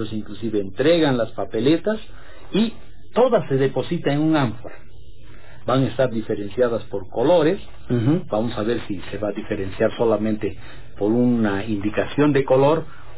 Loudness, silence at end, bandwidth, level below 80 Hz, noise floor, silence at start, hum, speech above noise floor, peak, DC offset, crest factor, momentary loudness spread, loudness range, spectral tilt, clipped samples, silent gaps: -21 LUFS; 0.05 s; 4 kHz; -46 dBFS; -45 dBFS; 0 s; none; 24 dB; -6 dBFS; 3%; 14 dB; 11 LU; 2 LU; -11 dB/octave; under 0.1%; none